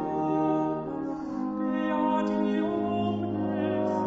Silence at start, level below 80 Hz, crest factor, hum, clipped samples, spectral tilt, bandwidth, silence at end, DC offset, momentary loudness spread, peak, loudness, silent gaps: 0 s; -60 dBFS; 12 dB; none; under 0.1%; -8.5 dB/octave; 7.6 kHz; 0 s; under 0.1%; 6 LU; -14 dBFS; -28 LUFS; none